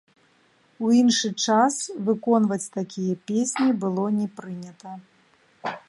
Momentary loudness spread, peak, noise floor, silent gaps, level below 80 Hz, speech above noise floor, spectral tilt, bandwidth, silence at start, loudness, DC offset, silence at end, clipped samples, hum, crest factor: 18 LU; -6 dBFS; -61 dBFS; none; -72 dBFS; 38 dB; -4.5 dB/octave; 11.5 kHz; 0.8 s; -23 LUFS; under 0.1%; 0.1 s; under 0.1%; none; 18 dB